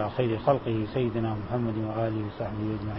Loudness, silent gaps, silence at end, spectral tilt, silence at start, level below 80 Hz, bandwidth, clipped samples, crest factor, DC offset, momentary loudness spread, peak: -29 LUFS; none; 0 s; -12 dB/octave; 0 s; -48 dBFS; 5.8 kHz; under 0.1%; 20 dB; 0.1%; 6 LU; -8 dBFS